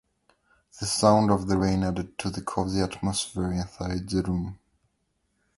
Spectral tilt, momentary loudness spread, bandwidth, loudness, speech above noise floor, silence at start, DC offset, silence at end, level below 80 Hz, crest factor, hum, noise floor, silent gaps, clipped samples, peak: -5.5 dB/octave; 11 LU; 11.5 kHz; -26 LUFS; 48 dB; 0.75 s; under 0.1%; 1.05 s; -44 dBFS; 22 dB; none; -74 dBFS; none; under 0.1%; -6 dBFS